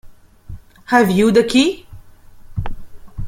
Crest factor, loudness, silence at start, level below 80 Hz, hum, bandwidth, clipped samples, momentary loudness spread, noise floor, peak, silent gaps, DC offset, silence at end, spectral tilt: 18 dB; -14 LUFS; 0.05 s; -36 dBFS; none; 16.5 kHz; under 0.1%; 21 LU; -39 dBFS; 0 dBFS; none; under 0.1%; 0 s; -5.5 dB/octave